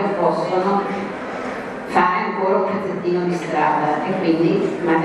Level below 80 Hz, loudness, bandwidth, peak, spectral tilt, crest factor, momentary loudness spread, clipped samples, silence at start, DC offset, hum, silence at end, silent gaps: -58 dBFS; -20 LUFS; 11 kHz; -2 dBFS; -7 dB/octave; 18 dB; 9 LU; under 0.1%; 0 s; under 0.1%; none; 0 s; none